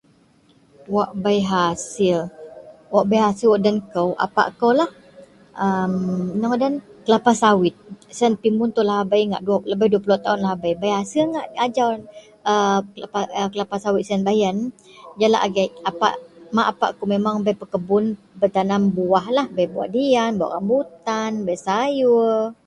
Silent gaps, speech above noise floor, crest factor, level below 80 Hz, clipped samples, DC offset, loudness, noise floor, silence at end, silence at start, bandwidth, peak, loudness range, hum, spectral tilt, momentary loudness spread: none; 36 dB; 20 dB; -60 dBFS; under 0.1%; under 0.1%; -20 LUFS; -56 dBFS; 0.15 s; 0.9 s; 11.5 kHz; 0 dBFS; 2 LU; none; -5.5 dB/octave; 7 LU